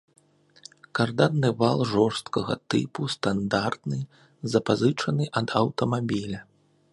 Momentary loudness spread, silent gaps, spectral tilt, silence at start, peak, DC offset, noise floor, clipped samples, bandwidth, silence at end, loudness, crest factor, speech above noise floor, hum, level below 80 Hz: 10 LU; none; -6 dB/octave; 0.95 s; -4 dBFS; under 0.1%; -52 dBFS; under 0.1%; 11.5 kHz; 0.5 s; -26 LUFS; 22 dB; 27 dB; none; -60 dBFS